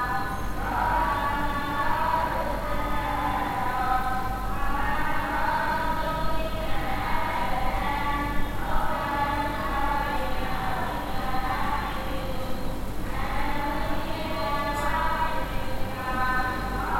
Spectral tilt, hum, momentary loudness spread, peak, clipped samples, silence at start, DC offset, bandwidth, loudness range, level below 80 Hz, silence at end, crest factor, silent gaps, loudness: -5.5 dB/octave; none; 6 LU; -10 dBFS; under 0.1%; 0 s; under 0.1%; 16.5 kHz; 3 LU; -34 dBFS; 0 s; 14 dB; none; -28 LUFS